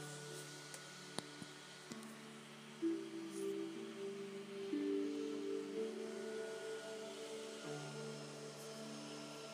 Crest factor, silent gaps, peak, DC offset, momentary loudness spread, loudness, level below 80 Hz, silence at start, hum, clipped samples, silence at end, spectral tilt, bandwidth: 26 dB; none; -22 dBFS; under 0.1%; 10 LU; -47 LUFS; under -90 dBFS; 0 s; none; under 0.1%; 0 s; -4 dB/octave; 15.5 kHz